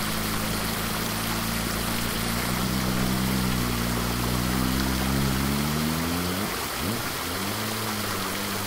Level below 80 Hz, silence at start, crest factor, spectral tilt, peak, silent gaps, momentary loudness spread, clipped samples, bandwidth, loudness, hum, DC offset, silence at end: -38 dBFS; 0 s; 16 dB; -4 dB/octave; -12 dBFS; none; 3 LU; under 0.1%; 16 kHz; -26 LUFS; none; under 0.1%; 0 s